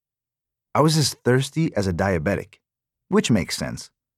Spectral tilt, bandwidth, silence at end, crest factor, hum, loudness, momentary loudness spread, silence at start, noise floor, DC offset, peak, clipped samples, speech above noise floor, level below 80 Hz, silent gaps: -5 dB/octave; 15.5 kHz; 0.3 s; 20 dB; none; -22 LUFS; 10 LU; 0.75 s; -89 dBFS; under 0.1%; -4 dBFS; under 0.1%; 67 dB; -48 dBFS; none